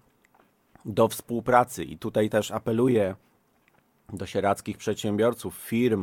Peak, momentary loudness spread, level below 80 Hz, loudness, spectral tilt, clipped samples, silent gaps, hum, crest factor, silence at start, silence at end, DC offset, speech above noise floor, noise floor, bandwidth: -4 dBFS; 12 LU; -60 dBFS; -26 LUFS; -6 dB/octave; under 0.1%; none; none; 22 dB; 0.85 s; 0 s; under 0.1%; 40 dB; -65 dBFS; 18.5 kHz